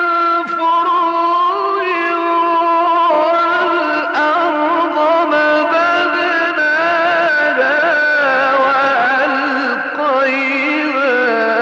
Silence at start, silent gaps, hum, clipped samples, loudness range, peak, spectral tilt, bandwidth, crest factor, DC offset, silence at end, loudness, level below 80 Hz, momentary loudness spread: 0 s; none; none; under 0.1%; 1 LU; -2 dBFS; -4 dB/octave; 8 kHz; 10 dB; under 0.1%; 0 s; -13 LUFS; -72 dBFS; 3 LU